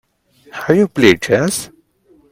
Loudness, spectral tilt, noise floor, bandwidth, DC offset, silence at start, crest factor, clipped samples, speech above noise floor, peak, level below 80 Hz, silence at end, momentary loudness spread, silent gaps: -14 LUFS; -4.5 dB/octave; -52 dBFS; 16.5 kHz; under 0.1%; 0.55 s; 16 dB; under 0.1%; 39 dB; 0 dBFS; -52 dBFS; 0.65 s; 19 LU; none